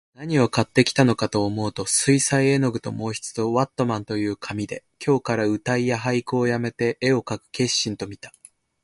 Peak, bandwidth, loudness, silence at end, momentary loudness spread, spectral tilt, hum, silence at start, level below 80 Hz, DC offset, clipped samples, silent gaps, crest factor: 0 dBFS; 11.5 kHz; -22 LUFS; 0.55 s; 11 LU; -4.5 dB/octave; none; 0.2 s; -56 dBFS; under 0.1%; under 0.1%; none; 22 dB